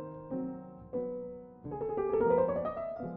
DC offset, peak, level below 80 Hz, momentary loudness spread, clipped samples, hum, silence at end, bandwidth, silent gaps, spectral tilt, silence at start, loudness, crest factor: under 0.1%; -16 dBFS; -60 dBFS; 16 LU; under 0.1%; none; 0 s; 4 kHz; none; -9 dB/octave; 0 s; -34 LUFS; 18 dB